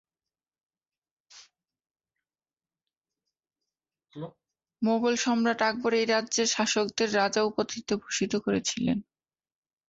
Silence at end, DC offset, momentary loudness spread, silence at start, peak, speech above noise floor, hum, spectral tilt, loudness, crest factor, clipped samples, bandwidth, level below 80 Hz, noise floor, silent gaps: 0.85 s; under 0.1%; 8 LU; 1.35 s; -12 dBFS; over 63 dB; none; -3 dB/octave; -27 LUFS; 18 dB; under 0.1%; 8 kHz; -68 dBFS; under -90 dBFS; none